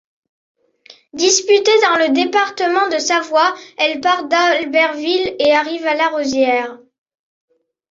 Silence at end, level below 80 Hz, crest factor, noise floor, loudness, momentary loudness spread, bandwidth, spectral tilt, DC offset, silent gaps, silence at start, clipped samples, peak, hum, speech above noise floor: 1.15 s; -62 dBFS; 16 dB; -47 dBFS; -15 LUFS; 6 LU; 7.8 kHz; -1 dB/octave; under 0.1%; none; 0.9 s; under 0.1%; -2 dBFS; none; 32 dB